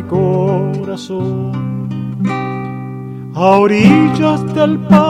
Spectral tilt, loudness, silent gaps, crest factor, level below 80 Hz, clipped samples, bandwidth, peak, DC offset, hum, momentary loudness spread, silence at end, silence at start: -8 dB/octave; -14 LUFS; none; 14 dB; -46 dBFS; 0.2%; 9.6 kHz; 0 dBFS; under 0.1%; none; 15 LU; 0 s; 0 s